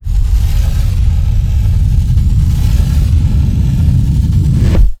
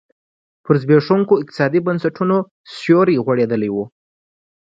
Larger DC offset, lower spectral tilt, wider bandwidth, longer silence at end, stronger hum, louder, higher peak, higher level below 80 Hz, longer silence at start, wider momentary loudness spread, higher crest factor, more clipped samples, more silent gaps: neither; about the same, -7.5 dB/octave vs -8.5 dB/octave; first, 14.5 kHz vs 7.8 kHz; second, 0.05 s vs 0.9 s; neither; first, -12 LUFS vs -17 LUFS; about the same, -2 dBFS vs 0 dBFS; first, -12 dBFS vs -62 dBFS; second, 0 s vs 0.7 s; second, 3 LU vs 11 LU; second, 8 dB vs 16 dB; neither; second, none vs 2.51-2.64 s